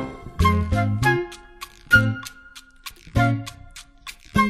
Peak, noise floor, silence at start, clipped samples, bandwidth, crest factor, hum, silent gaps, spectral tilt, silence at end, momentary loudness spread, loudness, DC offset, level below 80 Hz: -4 dBFS; -46 dBFS; 0 s; under 0.1%; 15 kHz; 20 dB; none; none; -6 dB/octave; 0 s; 22 LU; -21 LUFS; under 0.1%; -36 dBFS